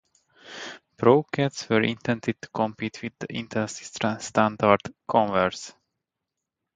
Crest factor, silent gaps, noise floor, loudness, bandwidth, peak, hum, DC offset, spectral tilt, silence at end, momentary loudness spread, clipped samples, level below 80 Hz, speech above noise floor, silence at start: 24 dB; none; -85 dBFS; -25 LUFS; 9.4 kHz; -2 dBFS; none; under 0.1%; -5.5 dB/octave; 1.05 s; 18 LU; under 0.1%; -60 dBFS; 60 dB; 0.45 s